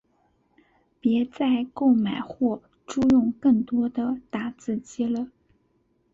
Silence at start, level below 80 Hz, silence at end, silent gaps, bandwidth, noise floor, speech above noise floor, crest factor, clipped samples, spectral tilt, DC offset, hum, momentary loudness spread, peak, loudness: 1.05 s; -58 dBFS; 0.85 s; none; 7.8 kHz; -68 dBFS; 44 dB; 14 dB; under 0.1%; -6.5 dB/octave; under 0.1%; none; 11 LU; -10 dBFS; -25 LUFS